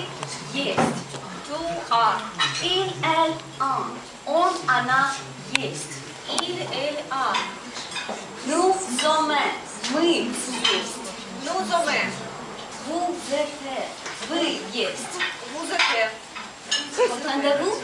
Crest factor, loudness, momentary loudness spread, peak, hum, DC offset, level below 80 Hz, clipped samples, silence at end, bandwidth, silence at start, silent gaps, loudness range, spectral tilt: 22 dB; -24 LUFS; 12 LU; -4 dBFS; none; under 0.1%; -62 dBFS; under 0.1%; 0 s; 11.5 kHz; 0 s; none; 4 LU; -2.5 dB/octave